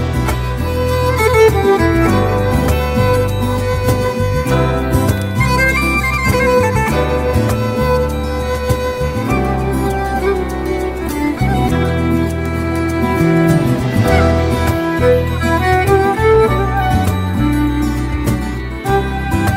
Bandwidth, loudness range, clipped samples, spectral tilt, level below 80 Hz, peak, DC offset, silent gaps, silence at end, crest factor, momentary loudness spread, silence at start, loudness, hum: 16.5 kHz; 4 LU; under 0.1%; -6.5 dB/octave; -22 dBFS; 0 dBFS; under 0.1%; none; 0 s; 14 dB; 6 LU; 0 s; -15 LUFS; none